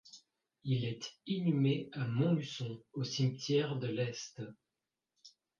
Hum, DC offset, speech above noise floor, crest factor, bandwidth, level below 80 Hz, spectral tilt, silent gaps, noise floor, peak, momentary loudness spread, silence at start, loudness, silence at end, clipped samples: none; under 0.1%; over 55 dB; 16 dB; 7.4 kHz; -74 dBFS; -6.5 dB/octave; none; under -90 dBFS; -20 dBFS; 13 LU; 0.05 s; -36 LUFS; 0.3 s; under 0.1%